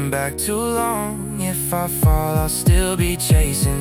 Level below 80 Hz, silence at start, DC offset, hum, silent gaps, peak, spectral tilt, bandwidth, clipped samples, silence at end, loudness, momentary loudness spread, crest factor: -24 dBFS; 0 s; under 0.1%; none; none; -4 dBFS; -5 dB/octave; 18 kHz; under 0.1%; 0 s; -19 LUFS; 6 LU; 14 dB